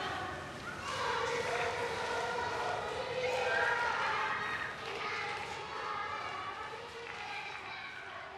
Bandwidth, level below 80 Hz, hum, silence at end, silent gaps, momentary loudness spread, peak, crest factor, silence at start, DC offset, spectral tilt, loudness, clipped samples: 13 kHz; -64 dBFS; none; 0 s; none; 10 LU; -20 dBFS; 16 dB; 0 s; under 0.1%; -3 dB/octave; -36 LUFS; under 0.1%